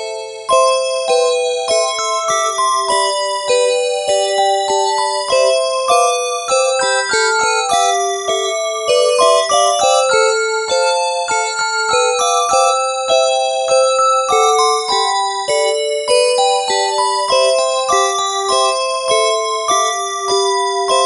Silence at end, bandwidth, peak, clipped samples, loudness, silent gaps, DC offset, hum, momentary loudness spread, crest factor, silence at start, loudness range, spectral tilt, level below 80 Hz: 0 s; 11.5 kHz; 0 dBFS; under 0.1%; -14 LUFS; none; under 0.1%; 60 Hz at -65 dBFS; 4 LU; 14 dB; 0 s; 2 LU; 0.5 dB/octave; -58 dBFS